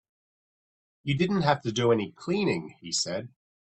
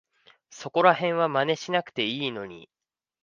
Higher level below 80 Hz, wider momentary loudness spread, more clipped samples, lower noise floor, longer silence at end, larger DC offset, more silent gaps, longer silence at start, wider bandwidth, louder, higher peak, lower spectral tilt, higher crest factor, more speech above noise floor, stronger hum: first, -62 dBFS vs -74 dBFS; second, 8 LU vs 16 LU; neither; first, under -90 dBFS vs -57 dBFS; second, 0.45 s vs 0.65 s; neither; neither; first, 1.05 s vs 0.5 s; first, 8.6 kHz vs 7.4 kHz; about the same, -27 LUFS vs -25 LUFS; second, -8 dBFS vs -4 dBFS; about the same, -5 dB/octave vs -4.5 dB/octave; about the same, 22 dB vs 22 dB; first, over 63 dB vs 32 dB; neither